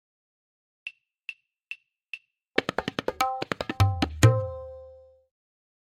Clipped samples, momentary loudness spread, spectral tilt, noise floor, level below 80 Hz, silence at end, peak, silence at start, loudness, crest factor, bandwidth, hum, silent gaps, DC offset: under 0.1%; 20 LU; -5.5 dB/octave; -51 dBFS; -50 dBFS; 1.05 s; -4 dBFS; 0.85 s; -26 LUFS; 26 dB; 16 kHz; none; none; under 0.1%